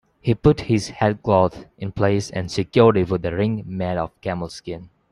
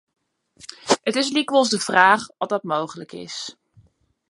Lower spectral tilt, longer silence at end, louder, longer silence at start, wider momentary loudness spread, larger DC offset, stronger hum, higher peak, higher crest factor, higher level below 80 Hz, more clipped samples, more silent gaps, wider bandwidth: first, -7 dB/octave vs -2.5 dB/octave; second, 0.25 s vs 0.8 s; about the same, -21 LUFS vs -20 LUFS; second, 0.25 s vs 0.85 s; second, 15 LU vs 20 LU; neither; neither; about the same, -2 dBFS vs 0 dBFS; about the same, 18 dB vs 22 dB; first, -44 dBFS vs -70 dBFS; neither; neither; about the same, 11.5 kHz vs 11.5 kHz